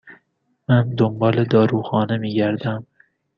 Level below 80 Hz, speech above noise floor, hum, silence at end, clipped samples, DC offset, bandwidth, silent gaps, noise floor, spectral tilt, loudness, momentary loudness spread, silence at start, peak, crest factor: -56 dBFS; 50 dB; none; 0.55 s; under 0.1%; under 0.1%; 5.8 kHz; none; -68 dBFS; -9.5 dB/octave; -19 LUFS; 10 LU; 0.05 s; -2 dBFS; 18 dB